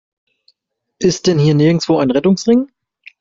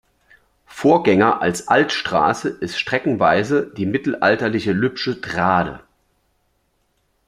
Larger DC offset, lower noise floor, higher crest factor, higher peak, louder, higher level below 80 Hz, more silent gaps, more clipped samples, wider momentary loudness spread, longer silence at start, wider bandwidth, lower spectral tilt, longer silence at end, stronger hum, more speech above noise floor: neither; about the same, -68 dBFS vs -66 dBFS; second, 12 dB vs 18 dB; about the same, -2 dBFS vs -2 dBFS; first, -14 LUFS vs -18 LUFS; about the same, -52 dBFS vs -54 dBFS; neither; neither; about the same, 6 LU vs 8 LU; first, 1 s vs 0.7 s; second, 7.8 kHz vs 14 kHz; about the same, -6.5 dB/octave vs -5.5 dB/octave; second, 0.55 s vs 1.45 s; neither; first, 56 dB vs 48 dB